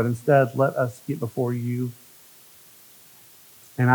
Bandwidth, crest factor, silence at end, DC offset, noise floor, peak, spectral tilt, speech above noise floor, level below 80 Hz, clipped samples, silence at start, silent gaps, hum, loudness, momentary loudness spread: over 20 kHz; 20 dB; 0 s; under 0.1%; -50 dBFS; -6 dBFS; -8 dB/octave; 27 dB; -76 dBFS; under 0.1%; 0 s; none; none; -24 LUFS; 13 LU